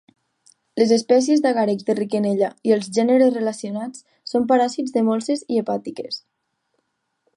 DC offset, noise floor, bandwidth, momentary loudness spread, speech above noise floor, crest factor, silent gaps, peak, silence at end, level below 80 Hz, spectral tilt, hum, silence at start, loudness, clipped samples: under 0.1%; -73 dBFS; 11 kHz; 14 LU; 53 dB; 16 dB; none; -4 dBFS; 1.2 s; -70 dBFS; -5 dB/octave; none; 0.75 s; -20 LUFS; under 0.1%